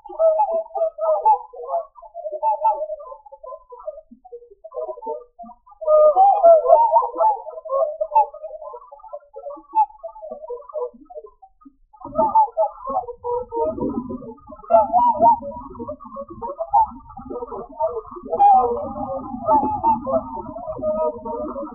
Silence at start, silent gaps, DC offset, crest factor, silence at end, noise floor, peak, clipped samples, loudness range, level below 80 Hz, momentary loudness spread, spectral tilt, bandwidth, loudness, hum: 0.05 s; none; under 0.1%; 20 dB; 0 s; -51 dBFS; 0 dBFS; under 0.1%; 11 LU; -52 dBFS; 22 LU; -4.5 dB/octave; 3.4 kHz; -19 LUFS; none